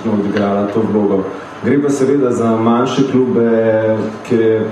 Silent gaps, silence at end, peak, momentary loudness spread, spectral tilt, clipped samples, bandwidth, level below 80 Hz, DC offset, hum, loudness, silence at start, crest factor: none; 0 s; -2 dBFS; 4 LU; -7 dB/octave; under 0.1%; 10.5 kHz; -56 dBFS; under 0.1%; none; -14 LUFS; 0 s; 12 dB